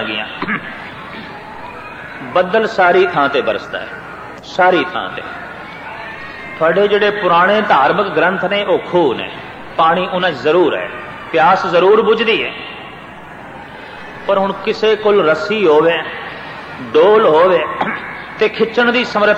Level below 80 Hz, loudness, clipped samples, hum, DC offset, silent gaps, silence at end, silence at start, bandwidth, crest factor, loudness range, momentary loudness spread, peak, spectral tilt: -52 dBFS; -14 LUFS; under 0.1%; none; under 0.1%; none; 0 s; 0 s; 8.4 kHz; 14 dB; 4 LU; 18 LU; 0 dBFS; -5.5 dB/octave